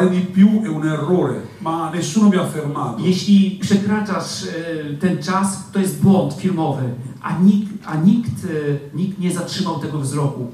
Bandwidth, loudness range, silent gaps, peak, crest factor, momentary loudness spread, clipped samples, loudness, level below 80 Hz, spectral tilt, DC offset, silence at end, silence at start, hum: 13.5 kHz; 2 LU; none; -2 dBFS; 16 dB; 10 LU; under 0.1%; -18 LUFS; -58 dBFS; -6.5 dB/octave; under 0.1%; 0 s; 0 s; none